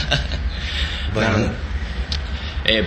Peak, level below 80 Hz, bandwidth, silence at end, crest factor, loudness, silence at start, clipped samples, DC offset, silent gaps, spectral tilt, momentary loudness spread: 0 dBFS; -26 dBFS; 8.8 kHz; 0 s; 22 dB; -22 LUFS; 0 s; under 0.1%; under 0.1%; none; -5 dB/octave; 8 LU